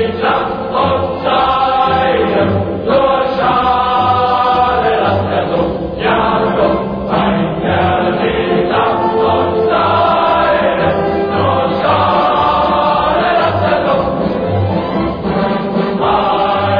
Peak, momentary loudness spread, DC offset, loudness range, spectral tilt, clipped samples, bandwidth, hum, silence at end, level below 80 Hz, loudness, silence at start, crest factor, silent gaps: 0 dBFS; 4 LU; under 0.1%; 2 LU; -8.5 dB/octave; under 0.1%; 5.2 kHz; none; 0 s; -36 dBFS; -13 LUFS; 0 s; 12 dB; none